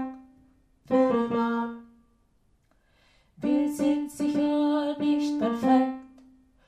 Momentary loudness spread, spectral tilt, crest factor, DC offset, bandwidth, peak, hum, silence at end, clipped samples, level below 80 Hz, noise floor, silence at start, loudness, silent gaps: 10 LU; -6 dB/octave; 16 dB; under 0.1%; 14 kHz; -10 dBFS; none; 0.6 s; under 0.1%; -64 dBFS; -66 dBFS; 0 s; -26 LUFS; none